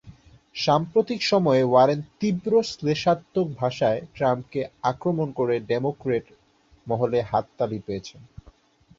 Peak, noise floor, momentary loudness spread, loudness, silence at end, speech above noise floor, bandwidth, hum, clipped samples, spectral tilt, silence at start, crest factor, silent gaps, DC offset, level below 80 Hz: -6 dBFS; -57 dBFS; 9 LU; -24 LUFS; 0.75 s; 34 dB; 7.8 kHz; none; under 0.1%; -6.5 dB/octave; 0.05 s; 18 dB; none; under 0.1%; -58 dBFS